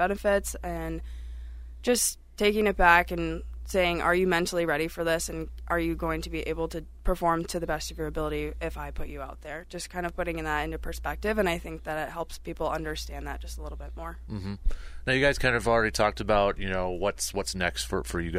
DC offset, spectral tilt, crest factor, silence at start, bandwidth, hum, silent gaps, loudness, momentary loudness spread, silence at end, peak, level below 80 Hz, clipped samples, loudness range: under 0.1%; -4 dB/octave; 22 dB; 0 s; 16 kHz; none; none; -28 LUFS; 14 LU; 0 s; -6 dBFS; -38 dBFS; under 0.1%; 8 LU